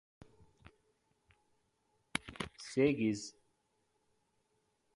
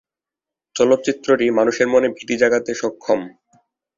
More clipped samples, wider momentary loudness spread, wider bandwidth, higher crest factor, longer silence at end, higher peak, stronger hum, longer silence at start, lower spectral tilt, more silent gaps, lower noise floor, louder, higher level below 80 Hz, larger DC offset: neither; first, 14 LU vs 8 LU; first, 11.5 kHz vs 7.8 kHz; first, 30 dB vs 18 dB; first, 1.65 s vs 0.7 s; second, -12 dBFS vs -2 dBFS; neither; first, 2.15 s vs 0.75 s; about the same, -5 dB/octave vs -4 dB/octave; neither; second, -79 dBFS vs -88 dBFS; second, -36 LUFS vs -18 LUFS; second, -68 dBFS vs -60 dBFS; neither